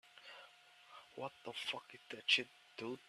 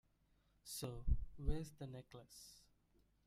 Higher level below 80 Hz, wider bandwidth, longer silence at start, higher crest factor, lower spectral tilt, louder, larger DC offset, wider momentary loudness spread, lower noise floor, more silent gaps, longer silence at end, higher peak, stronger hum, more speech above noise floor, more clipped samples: second, -90 dBFS vs -48 dBFS; second, 14 kHz vs 16 kHz; second, 0.15 s vs 0.65 s; first, 28 dB vs 20 dB; second, -2 dB/octave vs -5.5 dB/octave; first, -40 LUFS vs -48 LUFS; neither; first, 24 LU vs 17 LU; second, -64 dBFS vs -77 dBFS; neither; second, 0.05 s vs 0.7 s; first, -16 dBFS vs -24 dBFS; neither; second, 21 dB vs 35 dB; neither